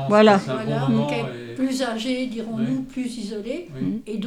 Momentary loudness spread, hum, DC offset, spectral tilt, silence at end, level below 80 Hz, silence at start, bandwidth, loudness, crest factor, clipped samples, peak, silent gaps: 13 LU; none; under 0.1%; -6 dB/octave; 0 s; -56 dBFS; 0 s; 13 kHz; -23 LUFS; 20 dB; under 0.1%; -2 dBFS; none